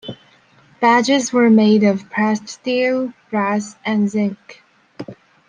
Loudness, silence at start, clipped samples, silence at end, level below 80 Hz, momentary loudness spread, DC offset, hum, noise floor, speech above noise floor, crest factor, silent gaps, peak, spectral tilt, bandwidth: -17 LUFS; 0.05 s; under 0.1%; 0.35 s; -66 dBFS; 23 LU; under 0.1%; none; -52 dBFS; 35 dB; 16 dB; none; -2 dBFS; -5 dB/octave; 9.6 kHz